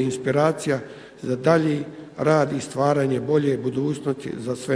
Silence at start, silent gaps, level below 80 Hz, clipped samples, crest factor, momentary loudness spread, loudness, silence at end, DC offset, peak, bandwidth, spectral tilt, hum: 0 s; none; -62 dBFS; under 0.1%; 20 dB; 9 LU; -23 LUFS; 0 s; under 0.1%; -2 dBFS; 11 kHz; -6.5 dB/octave; none